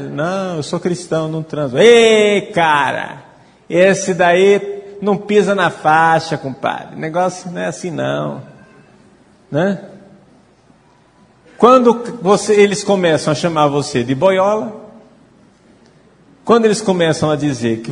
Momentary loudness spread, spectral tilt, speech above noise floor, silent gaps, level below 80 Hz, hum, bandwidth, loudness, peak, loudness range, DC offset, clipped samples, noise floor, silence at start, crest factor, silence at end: 12 LU; -5 dB/octave; 36 dB; none; -56 dBFS; none; 10.5 kHz; -14 LUFS; 0 dBFS; 9 LU; under 0.1%; under 0.1%; -50 dBFS; 0 s; 16 dB; 0 s